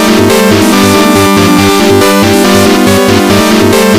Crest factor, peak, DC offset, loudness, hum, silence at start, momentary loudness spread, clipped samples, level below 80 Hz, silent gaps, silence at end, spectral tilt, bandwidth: 6 dB; 0 dBFS; 2%; -5 LUFS; none; 0 s; 1 LU; 5%; -34 dBFS; none; 0 s; -4.5 dB/octave; over 20 kHz